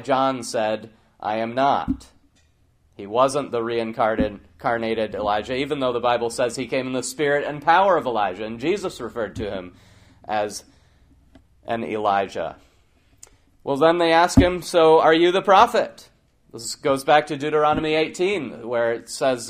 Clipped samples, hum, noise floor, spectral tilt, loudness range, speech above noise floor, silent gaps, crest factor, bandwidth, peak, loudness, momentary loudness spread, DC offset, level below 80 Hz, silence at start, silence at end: under 0.1%; none; -60 dBFS; -4.5 dB/octave; 10 LU; 39 dB; none; 22 dB; 15.5 kHz; 0 dBFS; -21 LUFS; 14 LU; under 0.1%; -44 dBFS; 0 s; 0 s